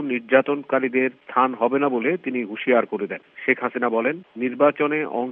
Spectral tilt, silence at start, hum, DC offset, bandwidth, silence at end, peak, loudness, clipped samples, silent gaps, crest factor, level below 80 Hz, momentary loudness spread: -9.5 dB/octave; 0 s; none; under 0.1%; 3.9 kHz; 0 s; -2 dBFS; -22 LUFS; under 0.1%; none; 20 dB; -78 dBFS; 8 LU